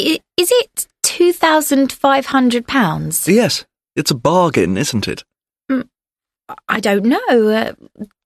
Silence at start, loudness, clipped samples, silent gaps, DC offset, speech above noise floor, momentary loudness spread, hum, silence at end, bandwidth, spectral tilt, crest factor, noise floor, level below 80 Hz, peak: 0 s; -15 LUFS; under 0.1%; none; under 0.1%; over 75 dB; 11 LU; none; 0.2 s; 13.5 kHz; -4 dB/octave; 16 dB; under -90 dBFS; -52 dBFS; 0 dBFS